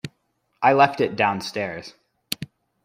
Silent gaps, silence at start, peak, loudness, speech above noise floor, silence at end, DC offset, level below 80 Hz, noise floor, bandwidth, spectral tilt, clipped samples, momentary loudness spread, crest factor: none; 0.05 s; -4 dBFS; -22 LUFS; 50 dB; 0.4 s; under 0.1%; -64 dBFS; -71 dBFS; 16 kHz; -4.5 dB/octave; under 0.1%; 20 LU; 20 dB